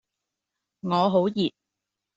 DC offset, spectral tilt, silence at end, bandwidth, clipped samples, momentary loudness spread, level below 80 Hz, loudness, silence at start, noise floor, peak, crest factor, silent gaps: under 0.1%; -5.5 dB/octave; 0.7 s; 7.8 kHz; under 0.1%; 9 LU; -70 dBFS; -24 LUFS; 0.85 s; -85 dBFS; -8 dBFS; 18 dB; none